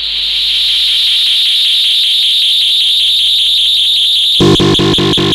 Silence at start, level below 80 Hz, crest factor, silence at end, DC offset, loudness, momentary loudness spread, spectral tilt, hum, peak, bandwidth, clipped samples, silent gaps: 0 s; -36 dBFS; 8 dB; 0 s; under 0.1%; -7 LUFS; 2 LU; -3.5 dB/octave; none; 0 dBFS; 16 kHz; under 0.1%; none